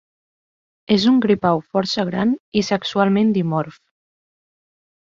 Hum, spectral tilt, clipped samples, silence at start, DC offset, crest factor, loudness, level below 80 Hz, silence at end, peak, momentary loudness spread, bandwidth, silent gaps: none; -6 dB/octave; under 0.1%; 0.9 s; under 0.1%; 18 dB; -19 LUFS; -58 dBFS; 1.3 s; -2 dBFS; 6 LU; 7.6 kHz; 2.40-2.52 s